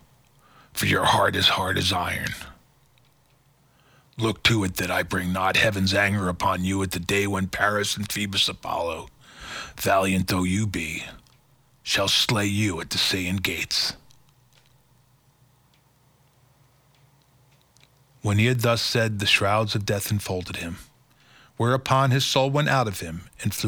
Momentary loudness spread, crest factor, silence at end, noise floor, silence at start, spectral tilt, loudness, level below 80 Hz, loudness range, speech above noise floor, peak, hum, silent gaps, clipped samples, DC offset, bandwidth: 14 LU; 22 dB; 0 s; -61 dBFS; 0.75 s; -4 dB/octave; -23 LUFS; -52 dBFS; 4 LU; 38 dB; -4 dBFS; none; none; under 0.1%; under 0.1%; over 20 kHz